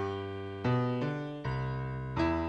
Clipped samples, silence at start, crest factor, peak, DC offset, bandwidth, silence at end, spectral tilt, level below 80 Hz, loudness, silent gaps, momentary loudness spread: under 0.1%; 0 s; 14 dB; -18 dBFS; under 0.1%; 6.8 kHz; 0 s; -8.5 dB/octave; -48 dBFS; -34 LUFS; none; 6 LU